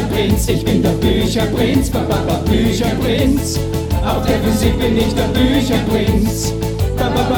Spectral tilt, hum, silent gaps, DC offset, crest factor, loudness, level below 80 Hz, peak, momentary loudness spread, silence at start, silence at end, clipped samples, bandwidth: -5.5 dB/octave; none; none; under 0.1%; 14 dB; -16 LUFS; -24 dBFS; 0 dBFS; 4 LU; 0 s; 0 s; under 0.1%; over 20 kHz